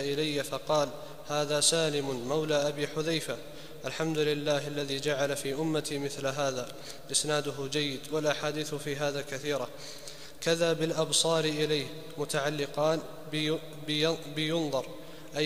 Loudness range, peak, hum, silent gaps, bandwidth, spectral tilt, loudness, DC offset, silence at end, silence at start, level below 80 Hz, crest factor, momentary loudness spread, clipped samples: 2 LU; -10 dBFS; none; none; 15.5 kHz; -3.5 dB/octave; -30 LUFS; 0.5%; 0 s; 0 s; -62 dBFS; 20 dB; 11 LU; under 0.1%